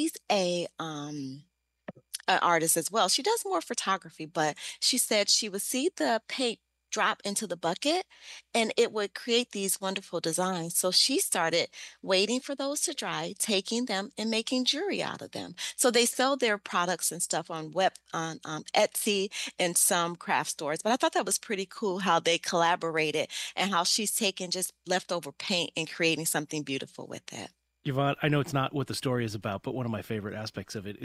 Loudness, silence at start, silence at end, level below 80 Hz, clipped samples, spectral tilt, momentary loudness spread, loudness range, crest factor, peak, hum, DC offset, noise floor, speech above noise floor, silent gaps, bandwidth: -28 LUFS; 0 s; 0 s; -72 dBFS; under 0.1%; -2.5 dB/octave; 12 LU; 4 LU; 20 dB; -10 dBFS; none; under 0.1%; -49 dBFS; 19 dB; none; 15.5 kHz